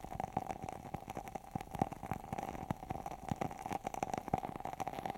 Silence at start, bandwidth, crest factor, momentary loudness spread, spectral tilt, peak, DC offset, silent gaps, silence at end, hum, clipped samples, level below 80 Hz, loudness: 0 s; 17 kHz; 28 dB; 6 LU; -6 dB/octave; -16 dBFS; under 0.1%; none; 0 s; none; under 0.1%; -58 dBFS; -43 LUFS